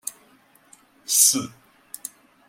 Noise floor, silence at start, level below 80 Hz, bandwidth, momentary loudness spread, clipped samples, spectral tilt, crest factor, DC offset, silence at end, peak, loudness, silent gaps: -57 dBFS; 0.05 s; -74 dBFS; 16.5 kHz; 25 LU; under 0.1%; -0.5 dB/octave; 24 dB; under 0.1%; 1 s; -4 dBFS; -17 LUFS; none